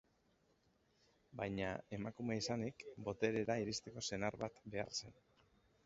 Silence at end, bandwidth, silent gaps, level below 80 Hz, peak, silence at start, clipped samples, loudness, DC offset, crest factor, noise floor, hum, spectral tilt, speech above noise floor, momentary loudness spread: 0.75 s; 7.6 kHz; none; -70 dBFS; -22 dBFS; 1.3 s; under 0.1%; -43 LUFS; under 0.1%; 24 dB; -77 dBFS; none; -4.5 dB/octave; 34 dB; 8 LU